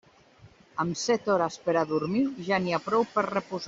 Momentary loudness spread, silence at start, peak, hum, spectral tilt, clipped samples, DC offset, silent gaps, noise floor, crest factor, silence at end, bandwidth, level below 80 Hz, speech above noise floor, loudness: 5 LU; 0.45 s; -10 dBFS; none; -5 dB/octave; under 0.1%; under 0.1%; none; -56 dBFS; 18 dB; 0 s; 7.8 kHz; -66 dBFS; 29 dB; -27 LUFS